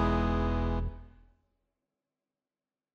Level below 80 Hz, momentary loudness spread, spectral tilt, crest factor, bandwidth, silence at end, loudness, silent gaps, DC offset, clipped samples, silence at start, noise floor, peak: -38 dBFS; 13 LU; -8.5 dB/octave; 18 dB; 6.6 kHz; 1.85 s; -31 LUFS; none; under 0.1%; under 0.1%; 0 s; under -90 dBFS; -16 dBFS